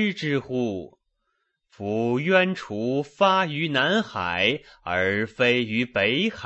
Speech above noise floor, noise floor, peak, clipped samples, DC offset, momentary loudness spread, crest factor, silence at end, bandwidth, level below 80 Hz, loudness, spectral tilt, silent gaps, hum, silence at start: 51 dB; -75 dBFS; -4 dBFS; under 0.1%; under 0.1%; 8 LU; 20 dB; 0 s; 8.2 kHz; -62 dBFS; -23 LUFS; -5.5 dB/octave; none; none; 0 s